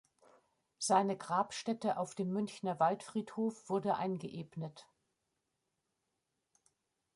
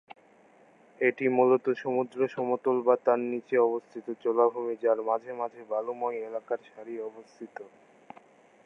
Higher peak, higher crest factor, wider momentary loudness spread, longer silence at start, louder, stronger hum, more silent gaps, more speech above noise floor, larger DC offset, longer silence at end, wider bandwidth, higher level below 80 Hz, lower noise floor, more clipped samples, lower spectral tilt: second, -18 dBFS vs -8 dBFS; about the same, 20 dB vs 20 dB; second, 12 LU vs 15 LU; second, 0.8 s vs 1 s; second, -36 LUFS vs -28 LUFS; neither; neither; first, 50 dB vs 31 dB; neither; first, 2.3 s vs 1 s; first, 11.5 kHz vs 6.4 kHz; first, -82 dBFS vs -88 dBFS; first, -86 dBFS vs -59 dBFS; neither; second, -5 dB/octave vs -8 dB/octave